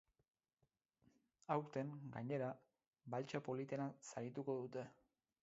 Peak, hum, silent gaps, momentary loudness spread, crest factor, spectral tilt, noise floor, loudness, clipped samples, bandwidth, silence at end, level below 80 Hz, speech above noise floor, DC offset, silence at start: -26 dBFS; none; 2.87-2.93 s; 11 LU; 22 dB; -6.5 dB/octave; -87 dBFS; -47 LUFS; under 0.1%; 7.6 kHz; 0.5 s; -88 dBFS; 41 dB; under 0.1%; 1.5 s